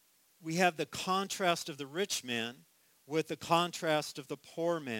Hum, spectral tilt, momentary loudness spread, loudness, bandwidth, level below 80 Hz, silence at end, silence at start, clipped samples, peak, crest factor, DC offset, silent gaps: none; -3.5 dB/octave; 11 LU; -34 LUFS; 17 kHz; -76 dBFS; 0 s; 0.4 s; under 0.1%; -12 dBFS; 22 dB; under 0.1%; none